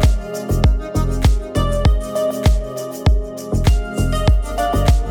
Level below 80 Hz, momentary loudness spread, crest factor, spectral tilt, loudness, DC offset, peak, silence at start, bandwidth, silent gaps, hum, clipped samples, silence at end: -18 dBFS; 5 LU; 14 dB; -6.5 dB/octave; -19 LUFS; under 0.1%; -2 dBFS; 0 s; 17.5 kHz; none; none; under 0.1%; 0 s